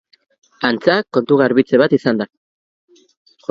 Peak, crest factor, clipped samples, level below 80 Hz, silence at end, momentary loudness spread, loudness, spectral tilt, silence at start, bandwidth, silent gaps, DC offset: 0 dBFS; 18 dB; under 0.1%; -60 dBFS; 1.25 s; 9 LU; -15 LUFS; -7.5 dB/octave; 0.6 s; 7.4 kHz; none; under 0.1%